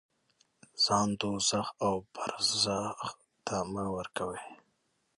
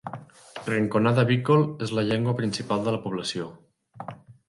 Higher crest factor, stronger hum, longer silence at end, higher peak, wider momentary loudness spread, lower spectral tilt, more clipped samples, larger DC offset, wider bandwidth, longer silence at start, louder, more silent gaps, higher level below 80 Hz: about the same, 20 dB vs 18 dB; neither; first, 0.65 s vs 0.15 s; second, -14 dBFS vs -8 dBFS; second, 14 LU vs 20 LU; second, -3 dB/octave vs -6.5 dB/octave; neither; neither; about the same, 11.5 kHz vs 11.5 kHz; first, 0.75 s vs 0.05 s; second, -31 LUFS vs -25 LUFS; neither; about the same, -62 dBFS vs -62 dBFS